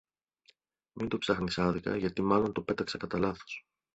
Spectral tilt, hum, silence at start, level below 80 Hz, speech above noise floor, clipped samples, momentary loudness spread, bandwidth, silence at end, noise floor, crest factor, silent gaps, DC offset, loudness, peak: -6 dB/octave; none; 0.95 s; -56 dBFS; 37 dB; under 0.1%; 11 LU; 8.2 kHz; 0.35 s; -68 dBFS; 22 dB; none; under 0.1%; -32 LUFS; -12 dBFS